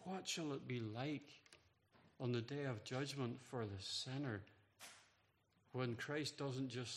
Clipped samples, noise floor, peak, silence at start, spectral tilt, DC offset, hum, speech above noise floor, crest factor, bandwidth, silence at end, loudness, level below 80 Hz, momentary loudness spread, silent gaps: under 0.1%; -79 dBFS; -28 dBFS; 0 s; -5 dB/octave; under 0.1%; none; 33 dB; 20 dB; 13 kHz; 0 s; -46 LUFS; -84 dBFS; 15 LU; none